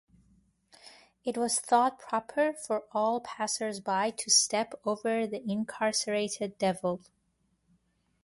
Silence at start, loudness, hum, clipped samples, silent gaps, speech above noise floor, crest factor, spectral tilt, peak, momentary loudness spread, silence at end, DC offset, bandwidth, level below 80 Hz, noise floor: 0.85 s; -30 LUFS; none; under 0.1%; none; 44 dB; 20 dB; -2.5 dB/octave; -10 dBFS; 11 LU; 1.25 s; under 0.1%; 11.5 kHz; -74 dBFS; -74 dBFS